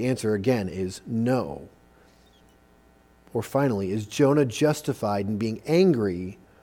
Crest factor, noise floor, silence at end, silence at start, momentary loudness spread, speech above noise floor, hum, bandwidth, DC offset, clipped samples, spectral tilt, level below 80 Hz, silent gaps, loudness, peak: 18 dB; -57 dBFS; 0.3 s; 0 s; 12 LU; 33 dB; none; 18.5 kHz; under 0.1%; under 0.1%; -6.5 dB/octave; -58 dBFS; none; -25 LUFS; -8 dBFS